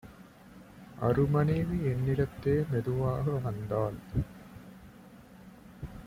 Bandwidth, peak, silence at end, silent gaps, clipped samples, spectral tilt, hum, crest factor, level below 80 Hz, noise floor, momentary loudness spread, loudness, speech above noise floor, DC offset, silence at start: 16 kHz; -16 dBFS; 0 s; none; under 0.1%; -9 dB/octave; none; 16 dB; -50 dBFS; -53 dBFS; 25 LU; -31 LUFS; 24 dB; under 0.1%; 0.05 s